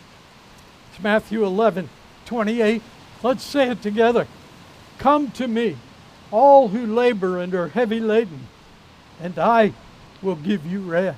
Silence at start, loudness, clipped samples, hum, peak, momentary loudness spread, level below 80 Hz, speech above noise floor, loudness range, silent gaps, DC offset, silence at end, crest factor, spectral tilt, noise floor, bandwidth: 0.95 s; -20 LUFS; under 0.1%; none; -2 dBFS; 13 LU; -56 dBFS; 28 dB; 4 LU; none; under 0.1%; 0 s; 18 dB; -6.5 dB/octave; -47 dBFS; 15 kHz